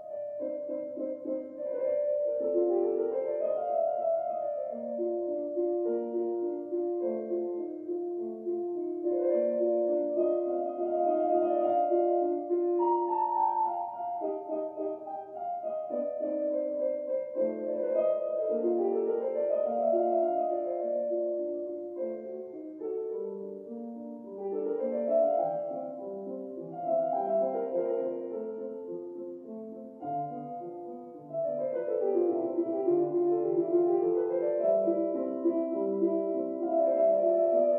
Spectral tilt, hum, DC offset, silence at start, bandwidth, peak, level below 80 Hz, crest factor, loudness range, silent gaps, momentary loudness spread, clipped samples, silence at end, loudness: -11 dB/octave; none; under 0.1%; 0 s; 3 kHz; -16 dBFS; -84 dBFS; 14 dB; 6 LU; none; 12 LU; under 0.1%; 0 s; -31 LUFS